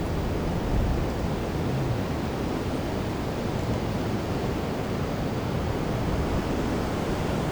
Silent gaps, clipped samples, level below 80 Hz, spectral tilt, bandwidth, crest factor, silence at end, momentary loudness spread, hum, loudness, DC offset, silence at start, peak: none; under 0.1%; -36 dBFS; -6.5 dB/octave; over 20 kHz; 14 dB; 0 s; 2 LU; none; -28 LUFS; under 0.1%; 0 s; -12 dBFS